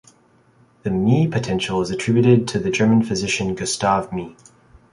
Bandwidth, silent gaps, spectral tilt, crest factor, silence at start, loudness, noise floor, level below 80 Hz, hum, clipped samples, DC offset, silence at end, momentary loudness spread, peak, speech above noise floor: 11.5 kHz; none; -5.5 dB/octave; 18 dB; 0.85 s; -19 LUFS; -56 dBFS; -48 dBFS; none; under 0.1%; under 0.1%; 0.6 s; 10 LU; -2 dBFS; 37 dB